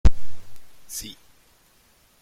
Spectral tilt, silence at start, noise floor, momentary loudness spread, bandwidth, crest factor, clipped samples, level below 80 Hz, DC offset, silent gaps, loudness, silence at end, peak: -5 dB/octave; 0.05 s; -59 dBFS; 23 LU; 15.5 kHz; 18 dB; under 0.1%; -30 dBFS; under 0.1%; none; -31 LUFS; 1.1 s; -2 dBFS